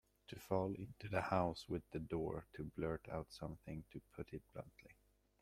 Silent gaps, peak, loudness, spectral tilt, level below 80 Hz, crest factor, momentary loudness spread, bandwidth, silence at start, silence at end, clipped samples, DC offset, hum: none; -22 dBFS; -45 LUFS; -7 dB/octave; -64 dBFS; 22 dB; 16 LU; 16 kHz; 0.3 s; 0.5 s; under 0.1%; under 0.1%; none